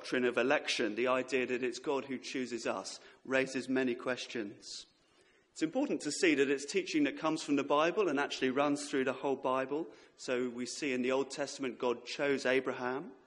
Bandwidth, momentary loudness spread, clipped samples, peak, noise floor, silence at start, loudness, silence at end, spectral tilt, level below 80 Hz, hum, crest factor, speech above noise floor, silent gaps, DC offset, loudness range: 11.5 kHz; 9 LU; under 0.1%; -14 dBFS; -68 dBFS; 0 s; -34 LUFS; 0.1 s; -3.5 dB/octave; -78 dBFS; none; 20 dB; 34 dB; none; under 0.1%; 5 LU